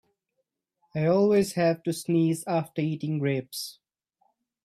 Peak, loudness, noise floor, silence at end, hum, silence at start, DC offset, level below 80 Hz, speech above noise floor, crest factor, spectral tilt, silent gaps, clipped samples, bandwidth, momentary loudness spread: -12 dBFS; -26 LUFS; -80 dBFS; 0.95 s; none; 0.95 s; under 0.1%; -68 dBFS; 55 dB; 16 dB; -6.5 dB/octave; none; under 0.1%; 15.5 kHz; 14 LU